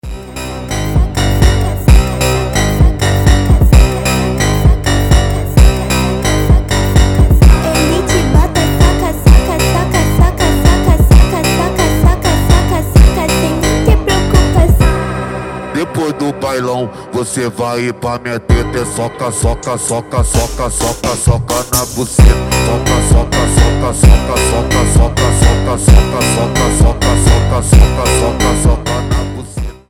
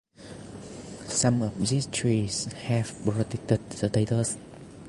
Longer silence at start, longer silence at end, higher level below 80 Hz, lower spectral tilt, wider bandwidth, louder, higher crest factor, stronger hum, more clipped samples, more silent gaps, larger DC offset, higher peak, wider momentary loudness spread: second, 0.05 s vs 0.2 s; first, 0.15 s vs 0 s; first, -12 dBFS vs -54 dBFS; about the same, -5 dB/octave vs -5 dB/octave; first, 17.5 kHz vs 11.5 kHz; first, -12 LUFS vs -27 LUFS; second, 10 dB vs 20 dB; neither; first, 0.9% vs under 0.1%; neither; neither; first, 0 dBFS vs -8 dBFS; second, 8 LU vs 17 LU